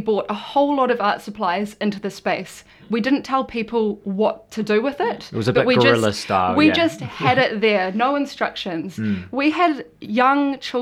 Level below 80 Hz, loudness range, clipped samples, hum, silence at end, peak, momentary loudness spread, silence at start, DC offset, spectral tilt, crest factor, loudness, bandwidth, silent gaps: -58 dBFS; 5 LU; under 0.1%; none; 0 s; -2 dBFS; 9 LU; 0 s; under 0.1%; -5.5 dB/octave; 18 dB; -20 LUFS; 14.5 kHz; none